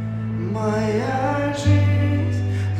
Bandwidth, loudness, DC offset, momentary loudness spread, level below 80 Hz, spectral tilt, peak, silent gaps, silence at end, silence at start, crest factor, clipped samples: 9.4 kHz; -21 LUFS; under 0.1%; 7 LU; -44 dBFS; -7.5 dB/octave; -6 dBFS; none; 0 s; 0 s; 14 dB; under 0.1%